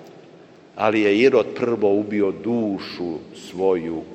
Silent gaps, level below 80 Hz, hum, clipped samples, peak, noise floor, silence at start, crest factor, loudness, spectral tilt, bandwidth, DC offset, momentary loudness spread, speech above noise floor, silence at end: none; -62 dBFS; none; under 0.1%; -4 dBFS; -47 dBFS; 0 s; 18 dB; -21 LUFS; -6.5 dB/octave; 8.6 kHz; under 0.1%; 14 LU; 26 dB; 0 s